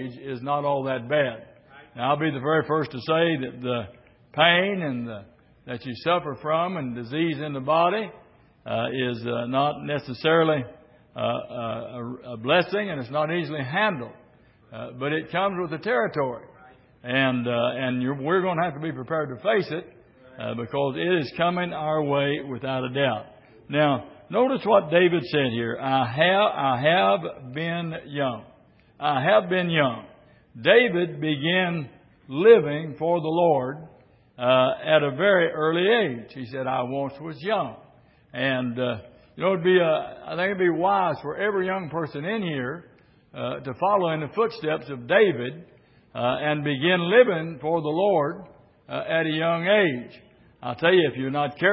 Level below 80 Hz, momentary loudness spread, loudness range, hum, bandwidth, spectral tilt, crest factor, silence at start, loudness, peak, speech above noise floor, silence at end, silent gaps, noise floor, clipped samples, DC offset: -64 dBFS; 14 LU; 5 LU; none; 5.8 kHz; -10.5 dB/octave; 22 dB; 0 s; -24 LUFS; -4 dBFS; 32 dB; 0 s; none; -56 dBFS; under 0.1%; under 0.1%